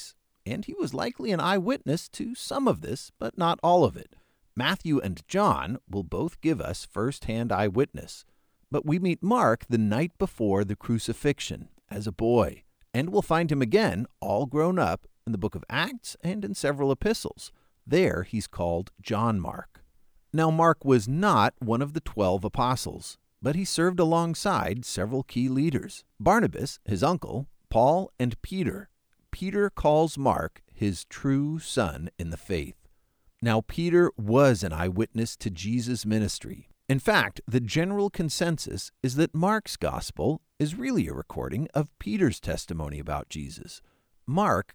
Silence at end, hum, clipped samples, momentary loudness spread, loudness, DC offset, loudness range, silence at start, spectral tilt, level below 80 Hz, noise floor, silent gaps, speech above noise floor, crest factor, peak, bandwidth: 0.1 s; none; under 0.1%; 13 LU; -27 LUFS; under 0.1%; 4 LU; 0 s; -6 dB/octave; -48 dBFS; -64 dBFS; none; 38 dB; 20 dB; -8 dBFS; over 20 kHz